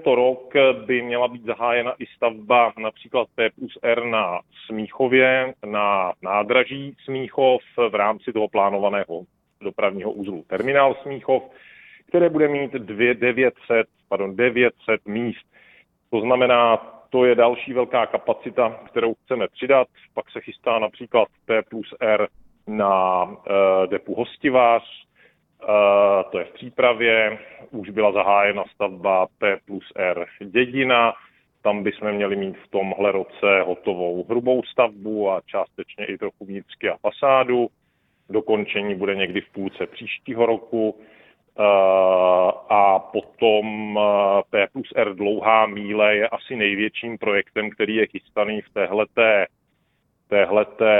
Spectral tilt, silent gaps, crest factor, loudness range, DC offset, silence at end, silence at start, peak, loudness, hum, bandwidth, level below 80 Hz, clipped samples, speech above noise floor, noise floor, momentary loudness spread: -8.5 dB/octave; none; 18 dB; 4 LU; under 0.1%; 0 s; 0 s; -2 dBFS; -21 LUFS; none; 4 kHz; -64 dBFS; under 0.1%; 48 dB; -68 dBFS; 12 LU